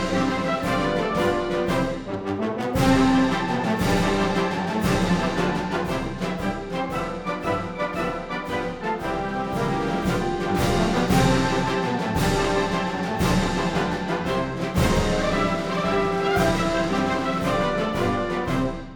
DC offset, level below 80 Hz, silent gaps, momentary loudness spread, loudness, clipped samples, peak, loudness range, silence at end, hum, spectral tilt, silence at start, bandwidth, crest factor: under 0.1%; -36 dBFS; none; 7 LU; -23 LUFS; under 0.1%; -6 dBFS; 5 LU; 0 s; none; -5.5 dB/octave; 0 s; over 20 kHz; 16 dB